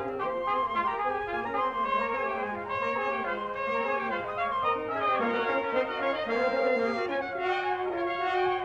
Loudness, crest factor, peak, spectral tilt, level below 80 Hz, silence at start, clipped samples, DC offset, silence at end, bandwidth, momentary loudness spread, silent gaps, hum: -29 LUFS; 14 dB; -16 dBFS; -5.5 dB/octave; -60 dBFS; 0 s; under 0.1%; under 0.1%; 0 s; 8 kHz; 4 LU; none; none